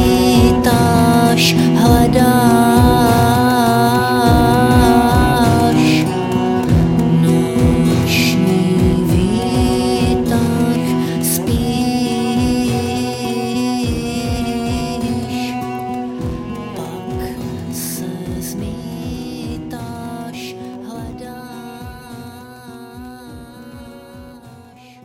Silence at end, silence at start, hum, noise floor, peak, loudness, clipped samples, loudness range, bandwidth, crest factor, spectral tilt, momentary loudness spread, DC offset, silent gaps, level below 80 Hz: 0.45 s; 0 s; none; -41 dBFS; 0 dBFS; -14 LUFS; under 0.1%; 19 LU; 17 kHz; 14 dB; -6 dB/octave; 20 LU; under 0.1%; none; -28 dBFS